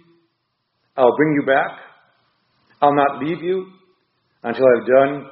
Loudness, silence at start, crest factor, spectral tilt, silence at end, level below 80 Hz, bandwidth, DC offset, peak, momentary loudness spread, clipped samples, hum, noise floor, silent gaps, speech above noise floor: -17 LUFS; 0.95 s; 18 dB; -4.5 dB/octave; 0 s; -64 dBFS; 4.9 kHz; under 0.1%; 0 dBFS; 12 LU; under 0.1%; none; -71 dBFS; none; 55 dB